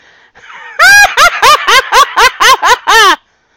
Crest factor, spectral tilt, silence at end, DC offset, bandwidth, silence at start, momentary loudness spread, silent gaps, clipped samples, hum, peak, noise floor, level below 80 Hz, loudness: 8 dB; 1 dB/octave; 0.4 s; 1%; over 20 kHz; 0.55 s; 5 LU; none; 3%; none; 0 dBFS; -39 dBFS; -36 dBFS; -5 LUFS